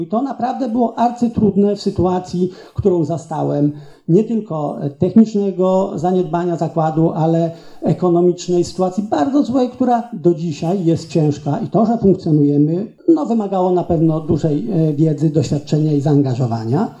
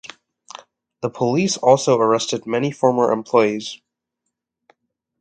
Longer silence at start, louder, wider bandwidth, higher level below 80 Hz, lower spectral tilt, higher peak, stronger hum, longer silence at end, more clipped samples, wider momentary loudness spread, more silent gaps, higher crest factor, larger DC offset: second, 0 s vs 1 s; about the same, -17 LUFS vs -18 LUFS; about the same, 8.6 kHz vs 9.4 kHz; first, -46 dBFS vs -66 dBFS; first, -8.5 dB/octave vs -5 dB/octave; about the same, 0 dBFS vs 0 dBFS; neither; second, 0.05 s vs 1.45 s; neither; second, 6 LU vs 24 LU; neither; second, 14 dB vs 20 dB; neither